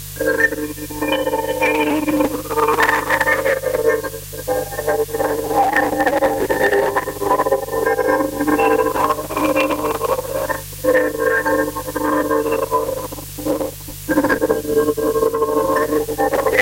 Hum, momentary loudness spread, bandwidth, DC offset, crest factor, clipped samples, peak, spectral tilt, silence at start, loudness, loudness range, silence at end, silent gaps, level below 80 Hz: 50 Hz at -35 dBFS; 7 LU; 17 kHz; under 0.1%; 16 dB; under 0.1%; -2 dBFS; -4.5 dB/octave; 0 s; -18 LUFS; 2 LU; 0 s; none; -42 dBFS